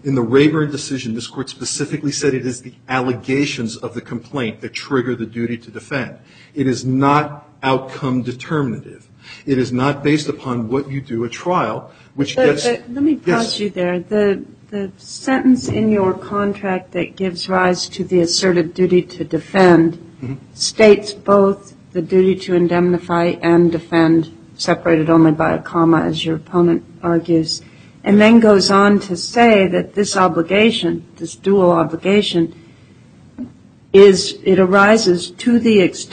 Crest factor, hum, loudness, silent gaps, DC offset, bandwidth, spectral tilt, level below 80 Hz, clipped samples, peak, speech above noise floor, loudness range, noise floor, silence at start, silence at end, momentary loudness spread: 16 dB; none; -16 LUFS; none; under 0.1%; 9.4 kHz; -5.5 dB/octave; -52 dBFS; under 0.1%; 0 dBFS; 29 dB; 8 LU; -45 dBFS; 0.05 s; 0.05 s; 14 LU